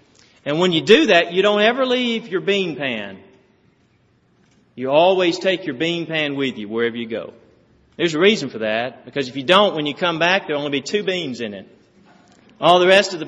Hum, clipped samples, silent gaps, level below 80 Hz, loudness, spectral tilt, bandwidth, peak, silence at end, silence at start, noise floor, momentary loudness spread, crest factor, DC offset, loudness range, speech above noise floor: none; under 0.1%; none; -64 dBFS; -18 LUFS; -2 dB/octave; 8 kHz; 0 dBFS; 0 s; 0.45 s; -59 dBFS; 14 LU; 20 dB; under 0.1%; 5 LU; 41 dB